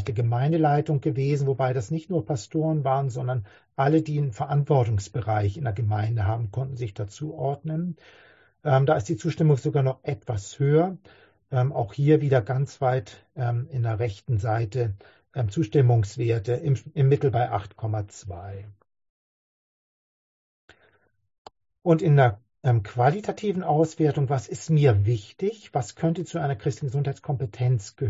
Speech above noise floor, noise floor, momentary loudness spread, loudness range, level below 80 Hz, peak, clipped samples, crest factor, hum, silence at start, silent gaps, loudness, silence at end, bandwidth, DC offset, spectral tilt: 40 dB; -64 dBFS; 10 LU; 4 LU; -50 dBFS; -6 dBFS; under 0.1%; 18 dB; none; 0 s; 19.09-20.68 s, 21.38-21.45 s; -25 LUFS; 0 s; 8 kHz; under 0.1%; -8 dB/octave